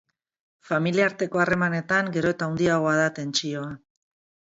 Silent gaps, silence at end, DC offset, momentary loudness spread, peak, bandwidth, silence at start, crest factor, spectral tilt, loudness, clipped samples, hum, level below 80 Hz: none; 0.75 s; under 0.1%; 9 LU; -6 dBFS; 8 kHz; 0.7 s; 18 dB; -5 dB/octave; -24 LUFS; under 0.1%; none; -60 dBFS